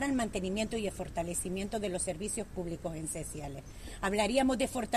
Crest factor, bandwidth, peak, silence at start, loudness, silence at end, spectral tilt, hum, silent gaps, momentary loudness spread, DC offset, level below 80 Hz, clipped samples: 18 dB; 14.5 kHz; -16 dBFS; 0 s; -34 LUFS; 0 s; -4 dB/octave; none; none; 11 LU; under 0.1%; -50 dBFS; under 0.1%